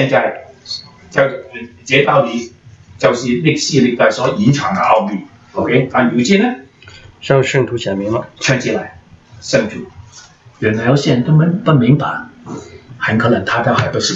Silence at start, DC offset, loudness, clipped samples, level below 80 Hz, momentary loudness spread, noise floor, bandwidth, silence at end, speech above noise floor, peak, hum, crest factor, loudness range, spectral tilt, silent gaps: 0 s; under 0.1%; -14 LUFS; under 0.1%; -50 dBFS; 18 LU; -41 dBFS; 8 kHz; 0 s; 27 dB; 0 dBFS; none; 14 dB; 4 LU; -5.5 dB/octave; none